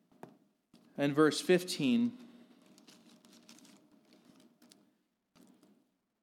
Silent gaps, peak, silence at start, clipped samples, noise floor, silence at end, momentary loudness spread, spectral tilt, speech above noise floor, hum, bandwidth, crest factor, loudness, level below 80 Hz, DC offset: none; -14 dBFS; 1 s; under 0.1%; -77 dBFS; 3.95 s; 16 LU; -5 dB/octave; 47 dB; none; 16 kHz; 22 dB; -31 LUFS; under -90 dBFS; under 0.1%